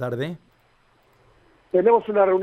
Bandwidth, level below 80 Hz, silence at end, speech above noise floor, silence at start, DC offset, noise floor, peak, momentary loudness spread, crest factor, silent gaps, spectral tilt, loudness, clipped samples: 6 kHz; -64 dBFS; 0 s; 41 dB; 0 s; under 0.1%; -60 dBFS; -6 dBFS; 14 LU; 18 dB; none; -8.5 dB/octave; -21 LUFS; under 0.1%